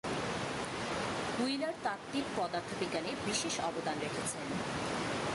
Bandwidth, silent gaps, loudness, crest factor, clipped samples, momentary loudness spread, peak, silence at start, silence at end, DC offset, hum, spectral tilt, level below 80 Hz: 11.5 kHz; none; -36 LUFS; 16 dB; under 0.1%; 3 LU; -22 dBFS; 0.05 s; 0 s; under 0.1%; none; -3.5 dB/octave; -62 dBFS